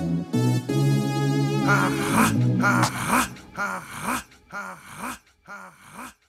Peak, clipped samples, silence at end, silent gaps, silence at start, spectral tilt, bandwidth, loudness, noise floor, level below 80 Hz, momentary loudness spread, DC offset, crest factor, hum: -6 dBFS; under 0.1%; 0.2 s; none; 0 s; -5.5 dB/octave; 16.5 kHz; -23 LUFS; -44 dBFS; -52 dBFS; 20 LU; under 0.1%; 18 dB; none